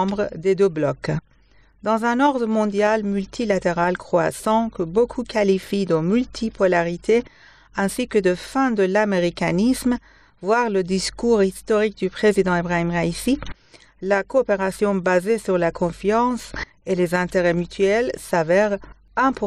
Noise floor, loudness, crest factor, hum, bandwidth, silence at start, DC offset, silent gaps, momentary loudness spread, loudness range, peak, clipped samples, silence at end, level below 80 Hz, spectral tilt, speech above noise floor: -54 dBFS; -21 LUFS; 14 dB; none; 14 kHz; 0 s; 0.1%; none; 6 LU; 1 LU; -6 dBFS; under 0.1%; 0 s; -46 dBFS; -6 dB/octave; 34 dB